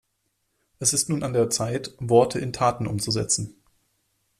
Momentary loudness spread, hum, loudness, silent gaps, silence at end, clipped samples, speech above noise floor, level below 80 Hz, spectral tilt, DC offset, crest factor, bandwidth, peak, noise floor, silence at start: 8 LU; none; -23 LUFS; none; 0.9 s; under 0.1%; 51 dB; -54 dBFS; -4 dB/octave; under 0.1%; 20 dB; 14 kHz; -4 dBFS; -74 dBFS; 0.8 s